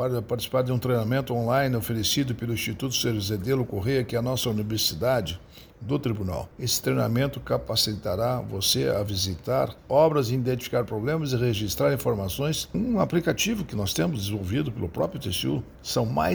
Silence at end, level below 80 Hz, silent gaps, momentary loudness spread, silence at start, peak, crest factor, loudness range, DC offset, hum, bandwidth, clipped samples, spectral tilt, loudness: 0 s; -48 dBFS; none; 5 LU; 0 s; -8 dBFS; 18 dB; 2 LU; under 0.1%; none; over 20 kHz; under 0.1%; -5 dB/octave; -26 LUFS